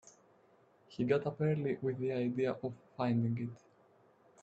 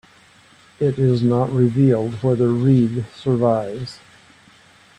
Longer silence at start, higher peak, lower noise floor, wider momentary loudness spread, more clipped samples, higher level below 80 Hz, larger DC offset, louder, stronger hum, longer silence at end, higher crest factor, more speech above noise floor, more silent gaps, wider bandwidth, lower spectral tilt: about the same, 0.9 s vs 0.8 s; second, -18 dBFS vs -4 dBFS; first, -67 dBFS vs -50 dBFS; about the same, 9 LU vs 8 LU; neither; second, -74 dBFS vs -54 dBFS; neither; second, -36 LUFS vs -18 LUFS; neither; second, 0.85 s vs 1.05 s; about the same, 20 dB vs 16 dB; about the same, 32 dB vs 33 dB; neither; second, 8 kHz vs 9 kHz; about the same, -8.5 dB/octave vs -9 dB/octave